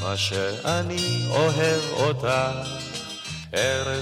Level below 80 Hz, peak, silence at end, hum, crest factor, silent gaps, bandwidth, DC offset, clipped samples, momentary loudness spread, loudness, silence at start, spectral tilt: -54 dBFS; -8 dBFS; 0 s; none; 16 dB; none; 16 kHz; under 0.1%; under 0.1%; 10 LU; -24 LUFS; 0 s; -4 dB/octave